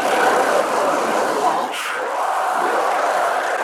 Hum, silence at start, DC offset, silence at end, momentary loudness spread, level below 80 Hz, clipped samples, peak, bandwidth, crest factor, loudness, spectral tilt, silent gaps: none; 0 s; under 0.1%; 0 s; 5 LU; -80 dBFS; under 0.1%; -4 dBFS; 19.5 kHz; 14 dB; -19 LUFS; -2 dB/octave; none